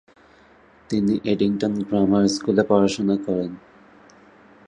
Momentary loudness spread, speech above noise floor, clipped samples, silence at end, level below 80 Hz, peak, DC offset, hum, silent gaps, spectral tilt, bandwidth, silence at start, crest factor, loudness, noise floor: 8 LU; 32 dB; under 0.1%; 1.1 s; -54 dBFS; -2 dBFS; under 0.1%; none; none; -6 dB/octave; 9.8 kHz; 0.9 s; 20 dB; -21 LUFS; -52 dBFS